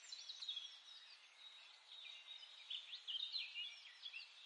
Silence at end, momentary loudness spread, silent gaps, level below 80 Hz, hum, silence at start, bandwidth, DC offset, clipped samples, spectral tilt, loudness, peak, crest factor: 0 s; 14 LU; none; under -90 dBFS; none; 0 s; 11 kHz; under 0.1%; under 0.1%; 6 dB/octave; -50 LUFS; -34 dBFS; 18 dB